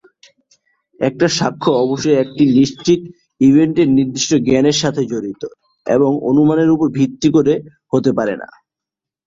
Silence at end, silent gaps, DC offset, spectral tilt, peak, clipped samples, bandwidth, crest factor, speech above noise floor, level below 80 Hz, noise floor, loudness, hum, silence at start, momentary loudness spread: 0.8 s; none; under 0.1%; -5.5 dB/octave; -2 dBFS; under 0.1%; 7.8 kHz; 14 dB; 71 dB; -52 dBFS; -85 dBFS; -15 LUFS; none; 1 s; 9 LU